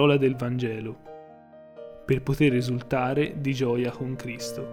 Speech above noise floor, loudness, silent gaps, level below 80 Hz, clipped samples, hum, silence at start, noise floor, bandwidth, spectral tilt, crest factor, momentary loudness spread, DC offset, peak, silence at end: 23 dB; -26 LUFS; none; -52 dBFS; under 0.1%; none; 0 s; -49 dBFS; 16.5 kHz; -6.5 dB/octave; 18 dB; 21 LU; under 0.1%; -8 dBFS; 0 s